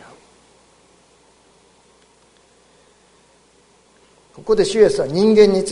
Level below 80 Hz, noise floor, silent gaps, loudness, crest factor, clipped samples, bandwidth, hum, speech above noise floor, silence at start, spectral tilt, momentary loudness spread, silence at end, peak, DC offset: -48 dBFS; -54 dBFS; none; -15 LUFS; 20 dB; under 0.1%; 11 kHz; 60 Hz at -65 dBFS; 40 dB; 4.45 s; -5.5 dB/octave; 8 LU; 0 s; 0 dBFS; under 0.1%